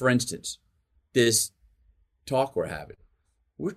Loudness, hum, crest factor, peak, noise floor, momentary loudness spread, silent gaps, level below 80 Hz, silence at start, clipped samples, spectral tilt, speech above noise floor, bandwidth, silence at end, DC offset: -26 LUFS; none; 20 dB; -8 dBFS; -71 dBFS; 20 LU; none; -60 dBFS; 0 s; under 0.1%; -3.5 dB/octave; 45 dB; 16 kHz; 0 s; under 0.1%